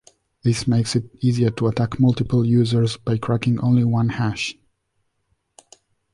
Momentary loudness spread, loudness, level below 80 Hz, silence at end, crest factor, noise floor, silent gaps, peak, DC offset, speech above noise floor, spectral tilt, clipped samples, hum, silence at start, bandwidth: 6 LU; -20 LUFS; -48 dBFS; 1.6 s; 14 dB; -71 dBFS; none; -6 dBFS; under 0.1%; 52 dB; -7 dB/octave; under 0.1%; none; 0.45 s; 11.5 kHz